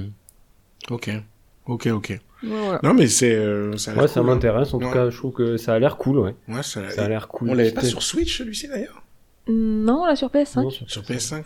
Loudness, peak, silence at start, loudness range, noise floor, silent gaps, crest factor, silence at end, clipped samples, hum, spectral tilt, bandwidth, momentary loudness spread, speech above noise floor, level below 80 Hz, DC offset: -21 LUFS; -6 dBFS; 0 s; 4 LU; -55 dBFS; none; 16 dB; 0 s; under 0.1%; none; -5 dB/octave; 17.5 kHz; 13 LU; 34 dB; -42 dBFS; under 0.1%